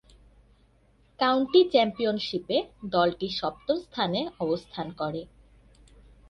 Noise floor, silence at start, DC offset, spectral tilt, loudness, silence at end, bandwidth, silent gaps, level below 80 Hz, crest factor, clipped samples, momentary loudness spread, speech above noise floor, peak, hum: -62 dBFS; 1.2 s; under 0.1%; -6.5 dB/octave; -27 LUFS; 1.05 s; 6.6 kHz; none; -58 dBFS; 20 dB; under 0.1%; 12 LU; 36 dB; -8 dBFS; 50 Hz at -60 dBFS